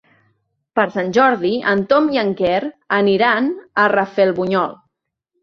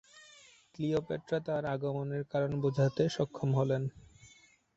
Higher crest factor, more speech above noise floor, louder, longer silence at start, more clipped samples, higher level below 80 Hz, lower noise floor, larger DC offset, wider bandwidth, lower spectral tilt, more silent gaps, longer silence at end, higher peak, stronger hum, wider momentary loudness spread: about the same, 16 dB vs 18 dB; first, 59 dB vs 30 dB; first, -17 LUFS vs -33 LUFS; first, 0.75 s vs 0.15 s; neither; first, -58 dBFS vs -64 dBFS; first, -75 dBFS vs -63 dBFS; neither; second, 7 kHz vs 8 kHz; about the same, -6.5 dB/octave vs -7.5 dB/octave; neither; first, 0.7 s vs 0.5 s; first, -2 dBFS vs -16 dBFS; neither; about the same, 6 LU vs 6 LU